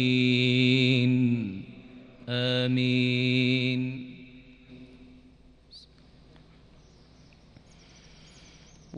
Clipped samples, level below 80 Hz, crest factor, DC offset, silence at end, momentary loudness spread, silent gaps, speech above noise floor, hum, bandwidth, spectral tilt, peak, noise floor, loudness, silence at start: under 0.1%; -60 dBFS; 18 dB; under 0.1%; 0 s; 23 LU; none; 31 dB; none; 8.2 kHz; -6.5 dB/octave; -10 dBFS; -55 dBFS; -25 LUFS; 0 s